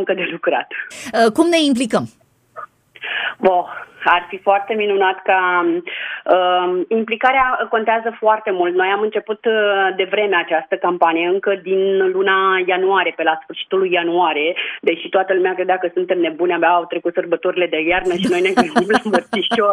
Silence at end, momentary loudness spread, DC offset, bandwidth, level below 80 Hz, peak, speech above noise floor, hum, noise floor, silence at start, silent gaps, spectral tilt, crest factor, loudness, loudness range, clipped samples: 0 s; 7 LU; under 0.1%; 12 kHz; -54 dBFS; 0 dBFS; 21 dB; none; -37 dBFS; 0 s; none; -4.5 dB/octave; 16 dB; -17 LUFS; 2 LU; under 0.1%